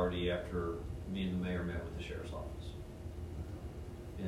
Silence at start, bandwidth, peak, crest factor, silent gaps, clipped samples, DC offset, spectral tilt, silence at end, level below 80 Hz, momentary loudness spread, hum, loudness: 0 s; 15 kHz; -22 dBFS; 18 dB; none; under 0.1%; under 0.1%; -7 dB/octave; 0 s; -48 dBFS; 11 LU; none; -41 LUFS